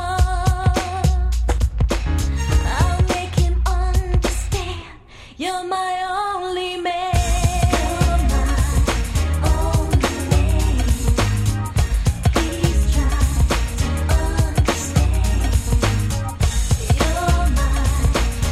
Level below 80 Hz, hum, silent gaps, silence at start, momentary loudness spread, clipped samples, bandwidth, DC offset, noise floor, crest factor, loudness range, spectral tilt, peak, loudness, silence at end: -20 dBFS; none; none; 0 s; 4 LU; under 0.1%; 14.5 kHz; under 0.1%; -40 dBFS; 14 dB; 3 LU; -5 dB/octave; -4 dBFS; -20 LUFS; 0 s